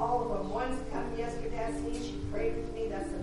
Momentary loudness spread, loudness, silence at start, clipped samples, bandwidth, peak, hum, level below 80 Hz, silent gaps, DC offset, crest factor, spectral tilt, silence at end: 4 LU; -35 LUFS; 0 s; under 0.1%; 11.5 kHz; -18 dBFS; none; -42 dBFS; none; under 0.1%; 14 dB; -6 dB/octave; 0 s